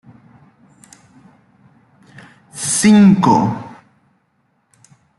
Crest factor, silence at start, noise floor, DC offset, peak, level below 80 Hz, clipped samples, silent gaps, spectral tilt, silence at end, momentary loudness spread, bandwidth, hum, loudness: 16 dB; 2.55 s; -63 dBFS; under 0.1%; -2 dBFS; -54 dBFS; under 0.1%; none; -5 dB/octave; 1.5 s; 24 LU; 12 kHz; none; -12 LUFS